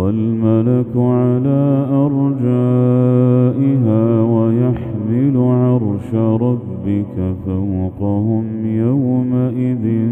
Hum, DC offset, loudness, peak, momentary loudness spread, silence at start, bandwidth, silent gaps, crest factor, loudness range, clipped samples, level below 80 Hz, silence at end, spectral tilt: none; under 0.1%; -15 LUFS; -2 dBFS; 6 LU; 0 s; 3.5 kHz; none; 14 dB; 4 LU; under 0.1%; -46 dBFS; 0 s; -12 dB/octave